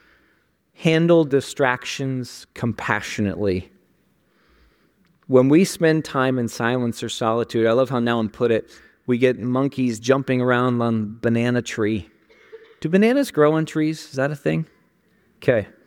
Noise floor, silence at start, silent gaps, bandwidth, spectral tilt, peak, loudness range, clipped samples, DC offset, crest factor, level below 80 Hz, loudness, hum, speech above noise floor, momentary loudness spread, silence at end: -63 dBFS; 0.8 s; none; 17 kHz; -6 dB/octave; -2 dBFS; 4 LU; under 0.1%; under 0.1%; 18 dB; -58 dBFS; -21 LUFS; none; 43 dB; 9 LU; 0.2 s